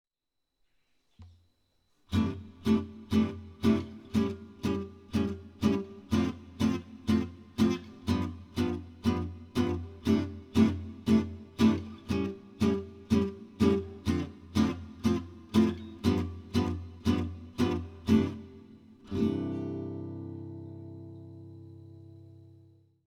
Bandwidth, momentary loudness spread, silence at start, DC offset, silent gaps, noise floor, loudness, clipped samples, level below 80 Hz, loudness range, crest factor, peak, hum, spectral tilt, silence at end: 14 kHz; 14 LU; 1.2 s; under 0.1%; none; -84 dBFS; -31 LUFS; under 0.1%; -52 dBFS; 6 LU; 20 dB; -12 dBFS; none; -7 dB/octave; 0.8 s